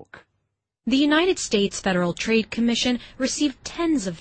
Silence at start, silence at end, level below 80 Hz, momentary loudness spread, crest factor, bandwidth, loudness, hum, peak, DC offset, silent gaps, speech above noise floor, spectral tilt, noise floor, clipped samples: 0 s; 0 s; -50 dBFS; 7 LU; 16 dB; 8.8 kHz; -22 LUFS; none; -8 dBFS; under 0.1%; none; 54 dB; -4 dB/octave; -76 dBFS; under 0.1%